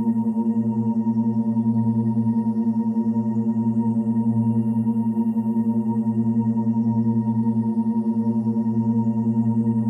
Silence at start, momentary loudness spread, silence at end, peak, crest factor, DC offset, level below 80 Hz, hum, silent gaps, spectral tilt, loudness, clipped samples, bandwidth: 0 s; 1 LU; 0 s; -12 dBFS; 10 dB; under 0.1%; -62 dBFS; none; none; -12 dB/octave; -22 LUFS; under 0.1%; 2 kHz